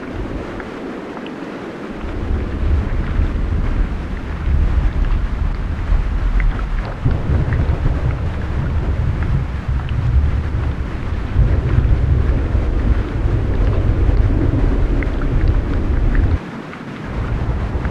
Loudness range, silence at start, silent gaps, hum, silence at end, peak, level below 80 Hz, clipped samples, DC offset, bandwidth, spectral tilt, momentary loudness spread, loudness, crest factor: 4 LU; 0 s; none; none; 0 s; -2 dBFS; -18 dBFS; under 0.1%; under 0.1%; 6.6 kHz; -8.5 dB/octave; 10 LU; -20 LUFS; 14 dB